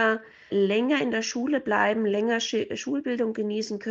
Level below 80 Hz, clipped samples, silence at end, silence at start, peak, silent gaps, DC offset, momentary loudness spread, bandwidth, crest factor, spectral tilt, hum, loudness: -70 dBFS; under 0.1%; 0 s; 0 s; -10 dBFS; none; under 0.1%; 6 LU; 7.8 kHz; 16 dB; -4 dB/octave; none; -26 LUFS